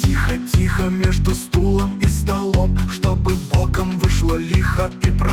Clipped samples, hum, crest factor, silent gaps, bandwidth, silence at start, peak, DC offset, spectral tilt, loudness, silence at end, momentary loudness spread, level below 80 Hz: under 0.1%; none; 14 dB; none; 17 kHz; 0 s; -4 dBFS; under 0.1%; -6 dB/octave; -19 LUFS; 0 s; 2 LU; -22 dBFS